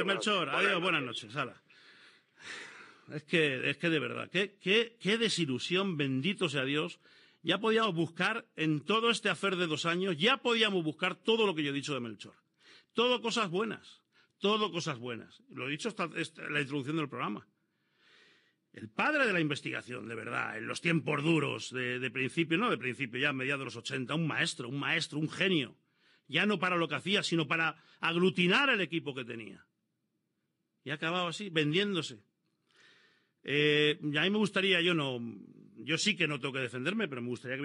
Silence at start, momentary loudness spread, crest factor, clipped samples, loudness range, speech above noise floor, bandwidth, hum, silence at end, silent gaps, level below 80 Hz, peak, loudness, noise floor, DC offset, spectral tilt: 0 s; 13 LU; 20 dB; under 0.1%; 6 LU; 50 dB; 11.5 kHz; none; 0 s; none; under -90 dBFS; -12 dBFS; -31 LUFS; -82 dBFS; under 0.1%; -4.5 dB/octave